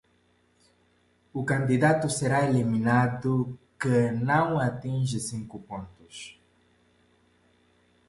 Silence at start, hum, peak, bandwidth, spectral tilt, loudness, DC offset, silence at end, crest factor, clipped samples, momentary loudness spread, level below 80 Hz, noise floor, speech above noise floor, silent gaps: 1.35 s; none; -10 dBFS; 11.5 kHz; -6.5 dB/octave; -26 LUFS; under 0.1%; 1.8 s; 18 dB; under 0.1%; 17 LU; -60 dBFS; -66 dBFS; 40 dB; none